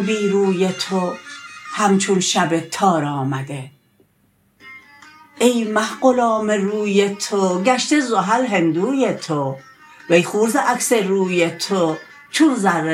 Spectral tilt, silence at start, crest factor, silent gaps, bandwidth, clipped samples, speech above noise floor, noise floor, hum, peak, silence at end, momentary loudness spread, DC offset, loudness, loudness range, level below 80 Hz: -4.5 dB/octave; 0 s; 18 dB; none; 16 kHz; under 0.1%; 43 dB; -60 dBFS; none; -2 dBFS; 0 s; 9 LU; under 0.1%; -18 LUFS; 4 LU; -68 dBFS